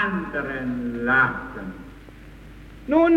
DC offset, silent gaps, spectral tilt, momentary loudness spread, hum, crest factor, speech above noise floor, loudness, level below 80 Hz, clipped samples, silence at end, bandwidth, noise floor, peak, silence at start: under 0.1%; none; -7.5 dB/octave; 25 LU; none; 16 dB; 22 dB; -23 LUFS; -46 dBFS; under 0.1%; 0 s; 6.4 kHz; -43 dBFS; -6 dBFS; 0 s